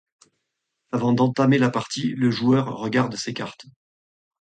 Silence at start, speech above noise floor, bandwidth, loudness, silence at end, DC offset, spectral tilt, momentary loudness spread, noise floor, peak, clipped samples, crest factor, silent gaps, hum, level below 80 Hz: 0.95 s; 57 dB; 9.2 kHz; -22 LUFS; 0.8 s; under 0.1%; -6 dB/octave; 11 LU; -79 dBFS; -6 dBFS; under 0.1%; 18 dB; none; none; -62 dBFS